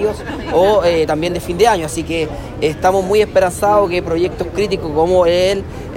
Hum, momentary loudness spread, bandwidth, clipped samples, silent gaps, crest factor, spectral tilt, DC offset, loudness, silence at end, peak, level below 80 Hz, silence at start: none; 8 LU; 16.5 kHz; under 0.1%; none; 14 dB; -5 dB/octave; under 0.1%; -15 LUFS; 0 s; 0 dBFS; -34 dBFS; 0 s